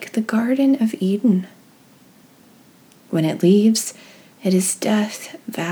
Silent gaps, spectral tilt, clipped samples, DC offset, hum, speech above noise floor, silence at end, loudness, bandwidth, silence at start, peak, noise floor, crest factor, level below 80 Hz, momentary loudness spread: none; -5.5 dB/octave; under 0.1%; under 0.1%; none; 32 dB; 0 s; -19 LUFS; over 20 kHz; 0 s; -4 dBFS; -50 dBFS; 16 dB; -76 dBFS; 12 LU